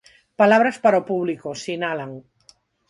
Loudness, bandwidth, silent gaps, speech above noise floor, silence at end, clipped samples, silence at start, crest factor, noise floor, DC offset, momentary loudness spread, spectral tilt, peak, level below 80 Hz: -20 LUFS; 11 kHz; none; 37 dB; 0.7 s; under 0.1%; 0.4 s; 18 dB; -56 dBFS; under 0.1%; 15 LU; -5.5 dB/octave; -4 dBFS; -68 dBFS